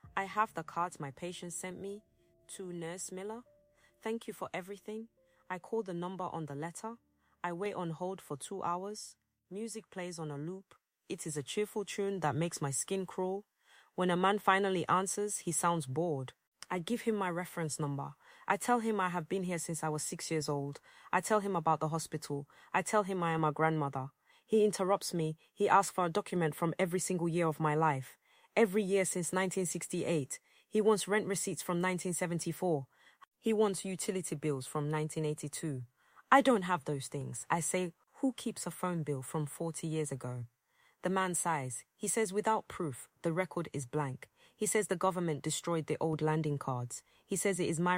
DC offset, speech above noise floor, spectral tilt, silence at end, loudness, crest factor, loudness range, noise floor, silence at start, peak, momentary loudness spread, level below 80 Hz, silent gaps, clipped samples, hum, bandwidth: under 0.1%; 34 dB; -4.5 dB/octave; 0 s; -35 LUFS; 26 dB; 9 LU; -69 dBFS; 0.05 s; -10 dBFS; 13 LU; -74 dBFS; 16.47-16.52 s, 33.27-33.31 s; under 0.1%; none; 16.5 kHz